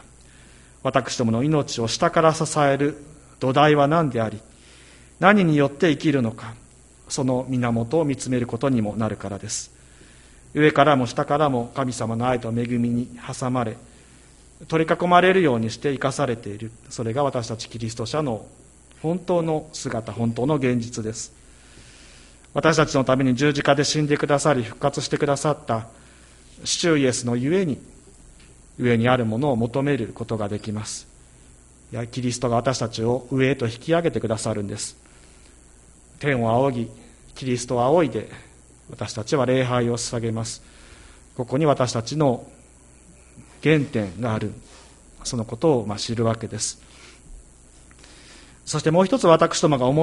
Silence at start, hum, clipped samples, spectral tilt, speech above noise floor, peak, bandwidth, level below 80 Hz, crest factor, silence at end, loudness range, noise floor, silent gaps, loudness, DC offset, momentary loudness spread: 0.85 s; none; under 0.1%; -5.5 dB/octave; 28 dB; -2 dBFS; 11.5 kHz; -50 dBFS; 22 dB; 0 s; 6 LU; -50 dBFS; none; -22 LUFS; under 0.1%; 13 LU